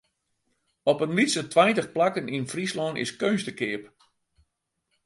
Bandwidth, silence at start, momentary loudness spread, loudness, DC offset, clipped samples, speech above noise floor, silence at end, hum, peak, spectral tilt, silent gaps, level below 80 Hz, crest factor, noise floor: 11.5 kHz; 0.85 s; 10 LU; -25 LUFS; under 0.1%; under 0.1%; 53 dB; 1.2 s; none; -6 dBFS; -4.5 dB/octave; none; -70 dBFS; 20 dB; -78 dBFS